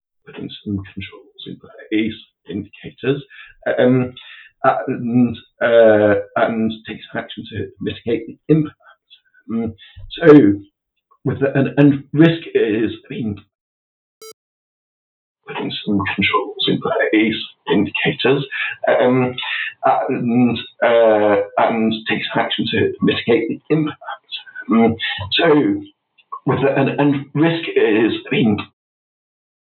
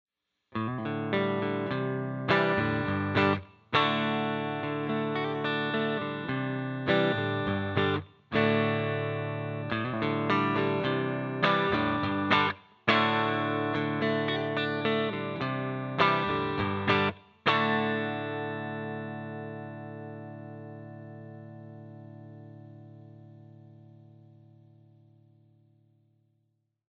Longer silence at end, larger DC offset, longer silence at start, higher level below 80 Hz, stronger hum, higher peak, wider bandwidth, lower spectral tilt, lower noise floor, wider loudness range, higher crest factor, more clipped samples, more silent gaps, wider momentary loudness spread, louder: second, 1.05 s vs 3.05 s; neither; second, 0.3 s vs 0.5 s; first, -56 dBFS vs -64 dBFS; neither; first, 0 dBFS vs -8 dBFS; second, 6 kHz vs 7.2 kHz; about the same, -8 dB/octave vs -7.5 dB/octave; second, -61 dBFS vs -76 dBFS; second, 8 LU vs 17 LU; about the same, 18 dB vs 22 dB; neither; first, 13.55-14.21 s, 14.33-15.35 s vs none; about the same, 16 LU vs 18 LU; first, -17 LUFS vs -29 LUFS